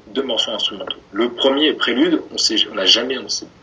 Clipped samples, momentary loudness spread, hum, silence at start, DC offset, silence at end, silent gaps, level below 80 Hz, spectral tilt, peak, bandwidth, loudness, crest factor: under 0.1%; 9 LU; none; 0.05 s; under 0.1%; 0.15 s; none; -58 dBFS; -2 dB/octave; 0 dBFS; 10 kHz; -17 LUFS; 18 dB